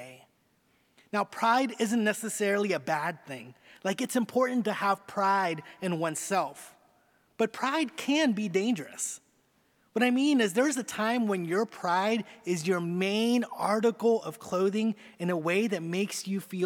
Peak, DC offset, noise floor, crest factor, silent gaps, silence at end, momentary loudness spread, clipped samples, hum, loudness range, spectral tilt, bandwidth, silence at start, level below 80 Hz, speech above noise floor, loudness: -12 dBFS; under 0.1%; -69 dBFS; 18 dB; none; 0 s; 9 LU; under 0.1%; none; 2 LU; -4.5 dB/octave; 18.5 kHz; 0 s; -82 dBFS; 40 dB; -29 LUFS